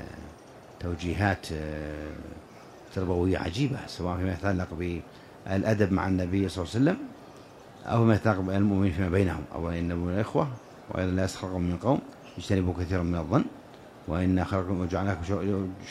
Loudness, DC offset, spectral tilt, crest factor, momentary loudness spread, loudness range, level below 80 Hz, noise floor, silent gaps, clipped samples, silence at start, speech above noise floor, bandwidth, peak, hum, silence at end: -29 LUFS; under 0.1%; -7.5 dB/octave; 20 dB; 19 LU; 4 LU; -48 dBFS; -49 dBFS; none; under 0.1%; 0 s; 21 dB; 13 kHz; -8 dBFS; none; 0 s